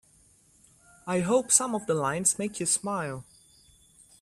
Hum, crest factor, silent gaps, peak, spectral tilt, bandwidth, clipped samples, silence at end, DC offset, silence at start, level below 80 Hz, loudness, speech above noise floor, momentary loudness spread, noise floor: none; 24 dB; none; -6 dBFS; -3.5 dB/octave; 15.5 kHz; under 0.1%; 1 s; under 0.1%; 1.05 s; -66 dBFS; -26 LUFS; 34 dB; 13 LU; -61 dBFS